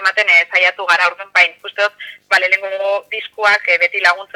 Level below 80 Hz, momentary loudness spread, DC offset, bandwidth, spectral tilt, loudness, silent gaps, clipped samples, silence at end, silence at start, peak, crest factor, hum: -70 dBFS; 9 LU; under 0.1%; 16.5 kHz; 0.5 dB/octave; -13 LUFS; none; under 0.1%; 0.1 s; 0 s; 0 dBFS; 16 dB; 50 Hz at -70 dBFS